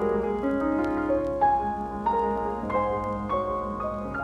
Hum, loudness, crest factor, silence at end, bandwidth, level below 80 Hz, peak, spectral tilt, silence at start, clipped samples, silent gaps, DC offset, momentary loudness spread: none; -27 LUFS; 14 dB; 0 s; 10 kHz; -44 dBFS; -12 dBFS; -8.5 dB/octave; 0 s; under 0.1%; none; under 0.1%; 6 LU